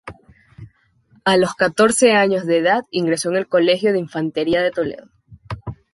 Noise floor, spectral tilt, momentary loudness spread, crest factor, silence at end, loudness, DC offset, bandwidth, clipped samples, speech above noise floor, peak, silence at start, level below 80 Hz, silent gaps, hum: -56 dBFS; -4 dB/octave; 16 LU; 16 dB; 0.2 s; -17 LUFS; under 0.1%; 11.5 kHz; under 0.1%; 39 dB; -2 dBFS; 0.05 s; -52 dBFS; none; none